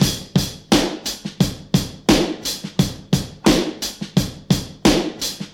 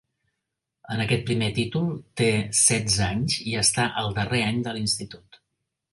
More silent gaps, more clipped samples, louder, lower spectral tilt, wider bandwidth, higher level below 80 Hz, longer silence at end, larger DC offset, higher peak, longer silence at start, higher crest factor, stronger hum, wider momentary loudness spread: neither; neither; first, -20 LUFS vs -23 LUFS; about the same, -4.5 dB/octave vs -3.5 dB/octave; first, 18 kHz vs 11.5 kHz; first, -36 dBFS vs -50 dBFS; second, 0.05 s vs 0.75 s; neither; first, 0 dBFS vs -4 dBFS; second, 0 s vs 0.9 s; about the same, 20 dB vs 22 dB; neither; about the same, 8 LU vs 9 LU